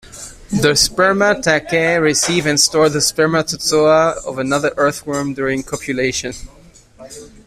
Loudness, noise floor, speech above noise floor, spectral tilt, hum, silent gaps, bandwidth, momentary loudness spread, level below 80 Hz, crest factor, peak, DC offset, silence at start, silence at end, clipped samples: -15 LUFS; -42 dBFS; 27 dB; -3 dB/octave; none; none; 15.5 kHz; 11 LU; -42 dBFS; 16 dB; 0 dBFS; under 0.1%; 0.15 s; 0.2 s; under 0.1%